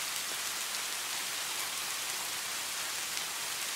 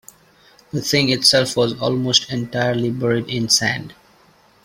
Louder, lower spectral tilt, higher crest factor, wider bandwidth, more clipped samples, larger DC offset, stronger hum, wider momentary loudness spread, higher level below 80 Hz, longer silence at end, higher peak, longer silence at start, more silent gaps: second, -34 LUFS vs -17 LUFS; second, 1.5 dB/octave vs -3.5 dB/octave; about the same, 22 dB vs 20 dB; about the same, 16 kHz vs 16.5 kHz; neither; neither; neither; second, 1 LU vs 10 LU; second, -74 dBFS vs -54 dBFS; second, 0 s vs 0.75 s; second, -14 dBFS vs 0 dBFS; second, 0 s vs 0.75 s; neither